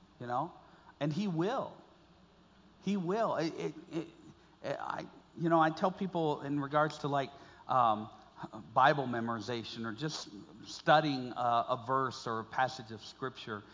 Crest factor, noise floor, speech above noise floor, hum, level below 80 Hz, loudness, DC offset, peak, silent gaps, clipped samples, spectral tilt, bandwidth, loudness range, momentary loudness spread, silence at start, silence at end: 22 dB; -62 dBFS; 29 dB; none; -72 dBFS; -34 LUFS; under 0.1%; -12 dBFS; none; under 0.1%; -6 dB/octave; 7.6 kHz; 6 LU; 17 LU; 0.2 s; 0 s